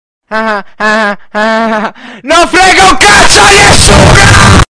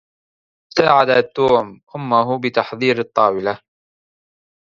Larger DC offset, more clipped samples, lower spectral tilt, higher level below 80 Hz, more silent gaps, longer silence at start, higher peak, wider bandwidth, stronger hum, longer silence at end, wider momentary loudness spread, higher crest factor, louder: neither; first, 5% vs under 0.1%; second, -3 dB/octave vs -6 dB/octave; first, -16 dBFS vs -58 dBFS; second, none vs 1.83-1.87 s; second, 0.3 s vs 0.75 s; about the same, 0 dBFS vs 0 dBFS; first, 11 kHz vs 7.4 kHz; neither; second, 0.1 s vs 1.15 s; about the same, 12 LU vs 11 LU; second, 4 dB vs 18 dB; first, -4 LUFS vs -17 LUFS